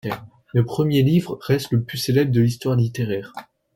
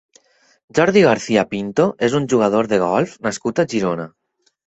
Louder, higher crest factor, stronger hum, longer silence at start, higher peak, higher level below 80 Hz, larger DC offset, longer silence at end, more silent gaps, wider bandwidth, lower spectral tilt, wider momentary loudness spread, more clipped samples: second, -21 LUFS vs -18 LUFS; about the same, 16 dB vs 16 dB; neither; second, 0.05 s vs 0.75 s; second, -6 dBFS vs -2 dBFS; about the same, -52 dBFS vs -56 dBFS; neither; second, 0.35 s vs 0.6 s; neither; first, 16.5 kHz vs 8.2 kHz; first, -7 dB/octave vs -5.5 dB/octave; first, 12 LU vs 9 LU; neither